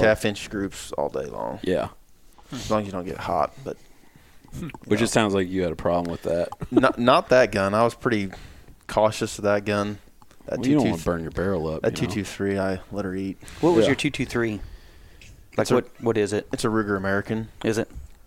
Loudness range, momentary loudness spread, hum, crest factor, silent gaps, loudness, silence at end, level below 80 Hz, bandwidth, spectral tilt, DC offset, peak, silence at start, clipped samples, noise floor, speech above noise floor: 7 LU; 14 LU; none; 20 dB; none; -24 LUFS; 0.2 s; -46 dBFS; 17 kHz; -5.5 dB/octave; 0.1%; -4 dBFS; 0 s; under 0.1%; -51 dBFS; 28 dB